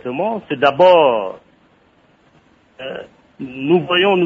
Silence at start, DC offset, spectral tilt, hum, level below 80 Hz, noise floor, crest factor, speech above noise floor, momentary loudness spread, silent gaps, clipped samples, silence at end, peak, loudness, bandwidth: 0.05 s; under 0.1%; -7 dB/octave; none; -60 dBFS; -54 dBFS; 16 dB; 39 dB; 22 LU; none; under 0.1%; 0 s; 0 dBFS; -15 LUFS; 7.2 kHz